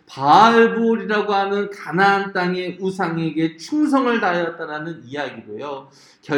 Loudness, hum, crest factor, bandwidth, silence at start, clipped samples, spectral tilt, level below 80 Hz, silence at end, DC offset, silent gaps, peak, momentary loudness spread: -18 LUFS; none; 18 dB; 11.5 kHz; 0.1 s; under 0.1%; -6 dB/octave; -68 dBFS; 0 s; under 0.1%; none; 0 dBFS; 17 LU